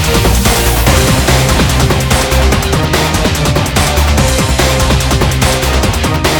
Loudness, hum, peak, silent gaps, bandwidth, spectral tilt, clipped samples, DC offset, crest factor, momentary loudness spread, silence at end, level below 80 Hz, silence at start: -10 LUFS; none; 0 dBFS; none; 19.5 kHz; -4 dB/octave; under 0.1%; under 0.1%; 10 dB; 2 LU; 0 s; -16 dBFS; 0 s